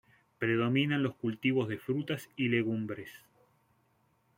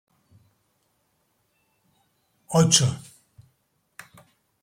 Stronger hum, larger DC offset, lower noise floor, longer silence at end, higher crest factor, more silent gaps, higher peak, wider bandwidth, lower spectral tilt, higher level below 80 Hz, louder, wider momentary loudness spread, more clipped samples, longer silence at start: neither; neither; about the same, -72 dBFS vs -71 dBFS; second, 1.2 s vs 1.65 s; second, 18 dB vs 26 dB; neither; second, -16 dBFS vs -2 dBFS; about the same, 16.5 kHz vs 15.5 kHz; first, -7 dB/octave vs -4 dB/octave; second, -72 dBFS vs -64 dBFS; second, -32 LUFS vs -20 LUFS; second, 9 LU vs 29 LU; neither; second, 0.4 s vs 2.5 s